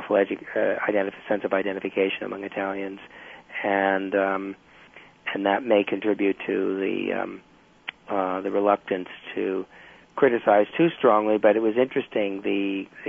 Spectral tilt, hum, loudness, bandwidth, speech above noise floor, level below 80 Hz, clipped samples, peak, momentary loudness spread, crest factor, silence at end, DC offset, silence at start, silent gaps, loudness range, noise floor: -7.5 dB/octave; none; -24 LUFS; 3.7 kHz; 26 dB; -68 dBFS; under 0.1%; -6 dBFS; 15 LU; 18 dB; 0 s; under 0.1%; 0 s; none; 5 LU; -50 dBFS